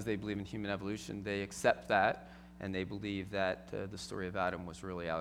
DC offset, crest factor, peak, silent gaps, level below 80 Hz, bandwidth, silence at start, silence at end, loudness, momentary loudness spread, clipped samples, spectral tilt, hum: under 0.1%; 24 dB; -14 dBFS; none; -60 dBFS; 16.5 kHz; 0 s; 0 s; -37 LUFS; 12 LU; under 0.1%; -5 dB/octave; none